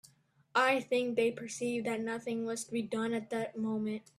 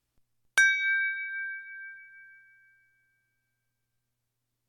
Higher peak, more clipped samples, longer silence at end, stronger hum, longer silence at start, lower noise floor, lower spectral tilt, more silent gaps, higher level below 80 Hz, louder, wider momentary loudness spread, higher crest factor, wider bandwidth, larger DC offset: about the same, -14 dBFS vs -12 dBFS; neither; second, 0.2 s vs 2.4 s; neither; about the same, 0.55 s vs 0.55 s; second, -67 dBFS vs -82 dBFS; first, -4 dB/octave vs 3.5 dB/octave; neither; about the same, -78 dBFS vs -82 dBFS; second, -34 LUFS vs -26 LUFS; second, 8 LU vs 21 LU; about the same, 20 dB vs 22 dB; second, 13.5 kHz vs 15.5 kHz; neither